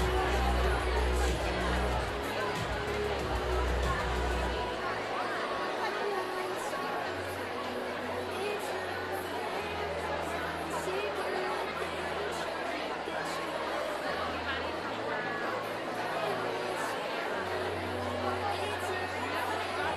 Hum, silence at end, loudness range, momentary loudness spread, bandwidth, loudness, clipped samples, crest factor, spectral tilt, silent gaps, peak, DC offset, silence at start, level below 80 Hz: none; 0 s; 3 LU; 5 LU; 14.5 kHz; -33 LUFS; under 0.1%; 16 dB; -4.5 dB/octave; none; -18 dBFS; under 0.1%; 0 s; -40 dBFS